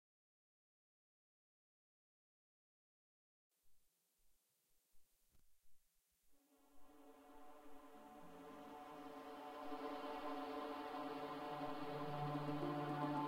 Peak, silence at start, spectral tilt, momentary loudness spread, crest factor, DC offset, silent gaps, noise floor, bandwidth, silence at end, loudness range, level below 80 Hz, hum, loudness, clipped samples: -32 dBFS; 3.65 s; -6.5 dB/octave; 18 LU; 20 dB; under 0.1%; none; -81 dBFS; 16 kHz; 0 s; 19 LU; -78 dBFS; none; -48 LUFS; under 0.1%